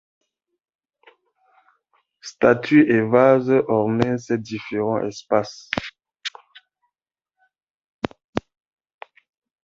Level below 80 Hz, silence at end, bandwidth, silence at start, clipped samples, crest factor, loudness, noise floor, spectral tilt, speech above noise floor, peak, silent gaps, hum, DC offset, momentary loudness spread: -56 dBFS; 1.25 s; 7.6 kHz; 2.25 s; under 0.1%; 22 dB; -20 LUFS; -87 dBFS; -6.5 dB/octave; 68 dB; -2 dBFS; 7.71-7.80 s, 7.89-7.99 s, 8.24-8.33 s; none; under 0.1%; 17 LU